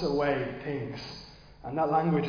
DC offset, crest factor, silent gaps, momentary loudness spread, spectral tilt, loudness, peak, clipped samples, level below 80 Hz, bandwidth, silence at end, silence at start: under 0.1%; 16 dB; none; 18 LU; -7.5 dB/octave; -30 LUFS; -14 dBFS; under 0.1%; -54 dBFS; 5.2 kHz; 0 s; 0 s